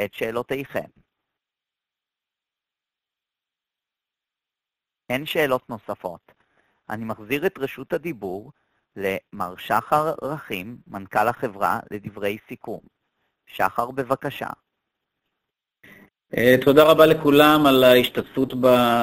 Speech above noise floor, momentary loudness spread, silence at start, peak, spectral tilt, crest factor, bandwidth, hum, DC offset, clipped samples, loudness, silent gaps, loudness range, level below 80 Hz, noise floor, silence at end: 68 dB; 20 LU; 0 s; 0 dBFS; -5.5 dB/octave; 22 dB; 15.5 kHz; none; under 0.1%; under 0.1%; -21 LUFS; none; 13 LU; -56 dBFS; -89 dBFS; 0 s